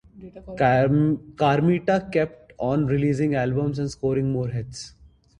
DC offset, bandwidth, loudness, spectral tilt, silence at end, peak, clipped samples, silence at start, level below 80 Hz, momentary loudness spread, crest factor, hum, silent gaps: under 0.1%; 10.5 kHz; -23 LUFS; -7.5 dB/octave; 0.5 s; -6 dBFS; under 0.1%; 0.15 s; -50 dBFS; 14 LU; 18 dB; none; none